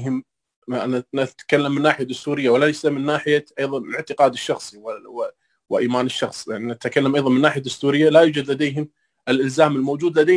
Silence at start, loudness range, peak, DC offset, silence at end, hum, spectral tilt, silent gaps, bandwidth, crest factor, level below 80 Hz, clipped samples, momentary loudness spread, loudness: 0 s; 5 LU; -2 dBFS; under 0.1%; 0 s; none; -5.5 dB/octave; 0.56-0.62 s; 10.5 kHz; 18 dB; -66 dBFS; under 0.1%; 12 LU; -20 LUFS